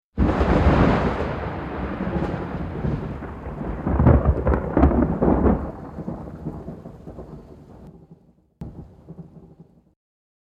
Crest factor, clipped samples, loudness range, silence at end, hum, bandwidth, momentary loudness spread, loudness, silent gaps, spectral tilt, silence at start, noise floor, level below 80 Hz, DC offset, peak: 22 dB; under 0.1%; 20 LU; 1 s; none; 7 kHz; 23 LU; -22 LUFS; none; -9.5 dB/octave; 0.15 s; -52 dBFS; -28 dBFS; under 0.1%; -2 dBFS